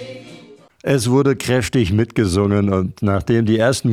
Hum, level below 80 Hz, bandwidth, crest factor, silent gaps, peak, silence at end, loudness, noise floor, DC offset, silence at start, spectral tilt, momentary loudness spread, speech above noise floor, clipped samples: none; -42 dBFS; 15 kHz; 14 dB; none; -4 dBFS; 0 s; -17 LUFS; -43 dBFS; under 0.1%; 0 s; -6 dB/octave; 5 LU; 27 dB; under 0.1%